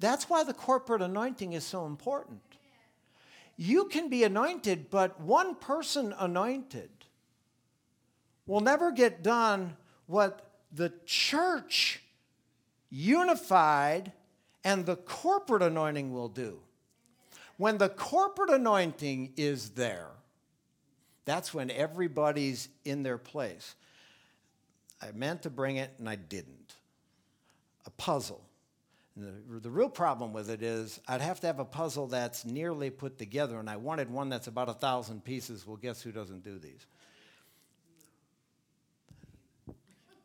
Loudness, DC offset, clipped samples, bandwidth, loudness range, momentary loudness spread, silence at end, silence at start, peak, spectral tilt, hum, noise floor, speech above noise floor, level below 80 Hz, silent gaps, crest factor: -31 LUFS; under 0.1%; under 0.1%; 19.5 kHz; 11 LU; 17 LU; 0.5 s; 0 s; -10 dBFS; -4.5 dB/octave; none; -75 dBFS; 44 dB; -76 dBFS; none; 22 dB